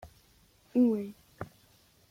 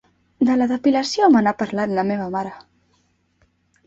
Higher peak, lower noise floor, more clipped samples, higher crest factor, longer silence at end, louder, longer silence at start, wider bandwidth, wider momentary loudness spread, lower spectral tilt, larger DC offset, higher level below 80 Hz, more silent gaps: second, -16 dBFS vs -4 dBFS; about the same, -64 dBFS vs -64 dBFS; neither; about the same, 18 dB vs 16 dB; second, 0.65 s vs 1.25 s; second, -29 LUFS vs -19 LUFS; second, 0.05 s vs 0.4 s; first, 15.5 kHz vs 8 kHz; first, 20 LU vs 11 LU; first, -8 dB/octave vs -5.5 dB/octave; neither; second, -66 dBFS vs -60 dBFS; neither